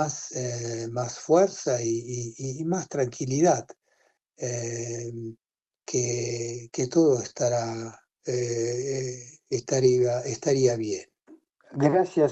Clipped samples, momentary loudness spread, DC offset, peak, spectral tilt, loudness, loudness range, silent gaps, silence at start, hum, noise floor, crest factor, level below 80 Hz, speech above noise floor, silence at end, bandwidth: under 0.1%; 13 LU; under 0.1%; -6 dBFS; -5.5 dB/octave; -27 LUFS; 3 LU; none; 0 s; none; -68 dBFS; 20 dB; -62 dBFS; 42 dB; 0 s; 8.4 kHz